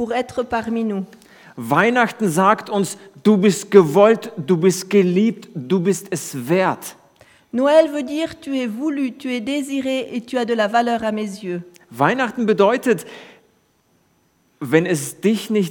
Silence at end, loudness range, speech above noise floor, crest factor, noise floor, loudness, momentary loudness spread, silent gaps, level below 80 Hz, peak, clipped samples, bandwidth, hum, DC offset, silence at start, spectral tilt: 0 s; 5 LU; 43 dB; 18 dB; -61 dBFS; -19 LUFS; 12 LU; none; -62 dBFS; 0 dBFS; under 0.1%; 19 kHz; none; under 0.1%; 0 s; -5.5 dB/octave